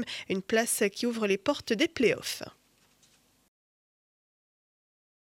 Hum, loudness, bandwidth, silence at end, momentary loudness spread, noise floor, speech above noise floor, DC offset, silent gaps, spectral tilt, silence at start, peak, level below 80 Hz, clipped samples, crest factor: none; -29 LUFS; 16.5 kHz; 2.85 s; 9 LU; -65 dBFS; 36 dB; under 0.1%; none; -3 dB/octave; 0 s; -12 dBFS; -68 dBFS; under 0.1%; 20 dB